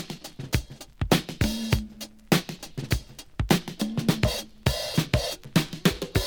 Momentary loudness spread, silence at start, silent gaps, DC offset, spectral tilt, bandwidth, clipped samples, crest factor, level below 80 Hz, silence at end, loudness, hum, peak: 13 LU; 0 s; none; under 0.1%; -5 dB/octave; over 20 kHz; under 0.1%; 24 dB; -38 dBFS; 0 s; -27 LUFS; none; -2 dBFS